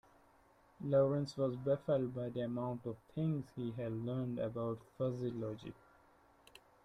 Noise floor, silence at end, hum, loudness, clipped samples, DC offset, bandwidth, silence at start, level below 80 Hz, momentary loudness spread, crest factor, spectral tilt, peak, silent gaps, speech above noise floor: -68 dBFS; 1.1 s; none; -39 LUFS; under 0.1%; under 0.1%; 11.5 kHz; 0.8 s; -70 dBFS; 11 LU; 18 dB; -9 dB/octave; -20 dBFS; none; 30 dB